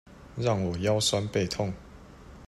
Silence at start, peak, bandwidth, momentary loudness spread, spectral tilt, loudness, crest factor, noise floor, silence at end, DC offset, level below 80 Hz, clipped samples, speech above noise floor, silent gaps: 0.1 s; -12 dBFS; 13 kHz; 12 LU; -4.5 dB/octave; -28 LUFS; 16 dB; -48 dBFS; 0 s; under 0.1%; -52 dBFS; under 0.1%; 21 dB; none